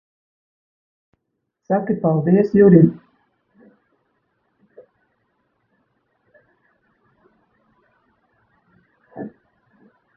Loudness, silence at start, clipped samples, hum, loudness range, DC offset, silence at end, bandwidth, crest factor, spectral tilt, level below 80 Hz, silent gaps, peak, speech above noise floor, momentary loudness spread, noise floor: -15 LUFS; 1.7 s; under 0.1%; none; 2 LU; under 0.1%; 0.9 s; 2.9 kHz; 22 dB; -12.5 dB/octave; -58 dBFS; none; 0 dBFS; 63 dB; 25 LU; -76 dBFS